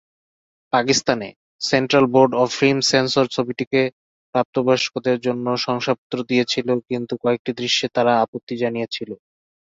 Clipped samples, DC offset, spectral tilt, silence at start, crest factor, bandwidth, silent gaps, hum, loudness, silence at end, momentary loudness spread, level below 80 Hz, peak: under 0.1%; under 0.1%; -4 dB/octave; 0.75 s; 20 dB; 8 kHz; 1.36-1.59 s, 3.67-3.71 s, 3.93-4.33 s, 4.45-4.53 s, 5.98-6.10 s, 7.39-7.45 s, 8.28-8.33 s, 8.43-8.47 s; none; -20 LUFS; 0.5 s; 9 LU; -60 dBFS; 0 dBFS